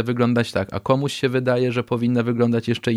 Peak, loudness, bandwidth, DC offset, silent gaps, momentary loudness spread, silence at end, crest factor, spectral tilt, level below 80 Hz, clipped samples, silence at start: -4 dBFS; -21 LUFS; 13.5 kHz; under 0.1%; none; 2 LU; 0 s; 16 dB; -7 dB/octave; -54 dBFS; under 0.1%; 0 s